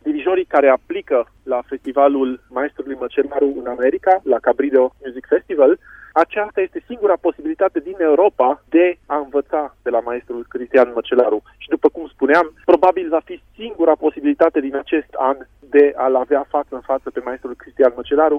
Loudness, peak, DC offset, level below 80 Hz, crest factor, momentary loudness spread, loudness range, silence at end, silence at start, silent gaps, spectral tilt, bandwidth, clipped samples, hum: -18 LUFS; -2 dBFS; under 0.1%; -54 dBFS; 16 dB; 10 LU; 2 LU; 0 s; 0.05 s; none; -6.5 dB/octave; 5.8 kHz; under 0.1%; none